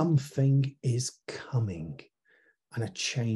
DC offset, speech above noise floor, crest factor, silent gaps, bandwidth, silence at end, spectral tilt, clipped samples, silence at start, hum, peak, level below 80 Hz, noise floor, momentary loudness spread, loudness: under 0.1%; 37 dB; 16 dB; none; 12 kHz; 0 s; -5.5 dB/octave; under 0.1%; 0 s; none; -14 dBFS; -64 dBFS; -67 dBFS; 16 LU; -30 LUFS